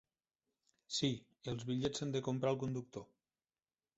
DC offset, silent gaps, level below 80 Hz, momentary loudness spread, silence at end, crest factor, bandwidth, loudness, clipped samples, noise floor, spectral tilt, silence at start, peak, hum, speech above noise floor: under 0.1%; none; -70 dBFS; 9 LU; 0.95 s; 20 dB; 8 kHz; -40 LUFS; under 0.1%; under -90 dBFS; -5.5 dB/octave; 0.9 s; -22 dBFS; none; over 51 dB